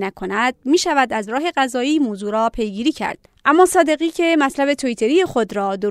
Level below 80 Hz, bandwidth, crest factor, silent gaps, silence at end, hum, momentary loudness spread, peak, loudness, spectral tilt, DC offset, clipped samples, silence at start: -48 dBFS; 14.5 kHz; 16 dB; none; 0 s; none; 7 LU; -2 dBFS; -18 LUFS; -3.5 dB/octave; under 0.1%; under 0.1%; 0 s